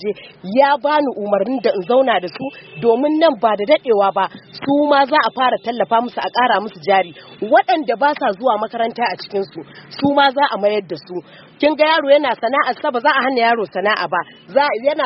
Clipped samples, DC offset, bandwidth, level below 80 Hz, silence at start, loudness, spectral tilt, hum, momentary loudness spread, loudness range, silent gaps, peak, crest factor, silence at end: under 0.1%; under 0.1%; 5.8 kHz; -66 dBFS; 0 s; -16 LUFS; -2 dB/octave; none; 11 LU; 2 LU; none; 0 dBFS; 16 dB; 0 s